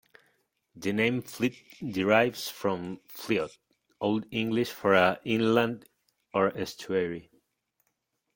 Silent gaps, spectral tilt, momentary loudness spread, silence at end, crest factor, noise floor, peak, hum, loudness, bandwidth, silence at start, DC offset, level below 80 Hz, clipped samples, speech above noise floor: none; -5.5 dB/octave; 13 LU; 1.15 s; 22 dB; -79 dBFS; -6 dBFS; none; -28 LUFS; 17 kHz; 0.75 s; under 0.1%; -68 dBFS; under 0.1%; 51 dB